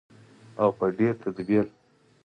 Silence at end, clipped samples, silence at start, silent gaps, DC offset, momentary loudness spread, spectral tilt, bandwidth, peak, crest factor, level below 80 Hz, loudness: 0.6 s; under 0.1%; 0.55 s; none; under 0.1%; 9 LU; -9.5 dB/octave; 9 kHz; -10 dBFS; 18 dB; -64 dBFS; -26 LUFS